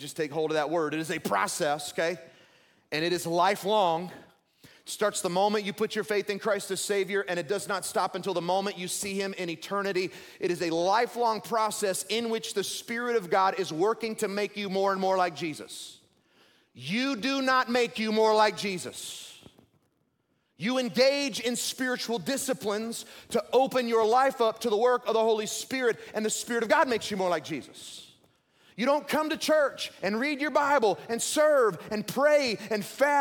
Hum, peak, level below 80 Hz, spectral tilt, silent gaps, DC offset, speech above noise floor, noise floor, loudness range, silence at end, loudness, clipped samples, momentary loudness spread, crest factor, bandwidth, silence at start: none; -10 dBFS; -74 dBFS; -3.5 dB/octave; none; under 0.1%; 46 dB; -74 dBFS; 4 LU; 0 s; -28 LUFS; under 0.1%; 10 LU; 20 dB; 18 kHz; 0 s